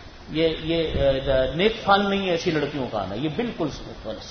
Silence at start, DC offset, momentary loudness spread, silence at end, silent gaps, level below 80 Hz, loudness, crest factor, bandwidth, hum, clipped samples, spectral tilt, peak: 0 s; under 0.1%; 10 LU; 0 s; none; -40 dBFS; -23 LUFS; 20 dB; 6.6 kHz; none; under 0.1%; -6 dB/octave; -4 dBFS